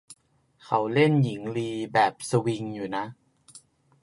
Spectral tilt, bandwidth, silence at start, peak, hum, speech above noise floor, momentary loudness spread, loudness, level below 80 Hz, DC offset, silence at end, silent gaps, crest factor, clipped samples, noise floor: -6 dB/octave; 11.5 kHz; 0.1 s; -8 dBFS; none; 34 dB; 10 LU; -26 LUFS; -68 dBFS; under 0.1%; 0.45 s; none; 20 dB; under 0.1%; -59 dBFS